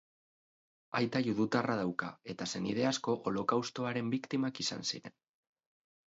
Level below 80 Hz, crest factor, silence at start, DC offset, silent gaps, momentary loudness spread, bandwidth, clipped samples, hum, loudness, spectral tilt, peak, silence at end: -74 dBFS; 20 dB; 0.9 s; under 0.1%; none; 7 LU; 8 kHz; under 0.1%; none; -35 LUFS; -4.5 dB/octave; -16 dBFS; 1.05 s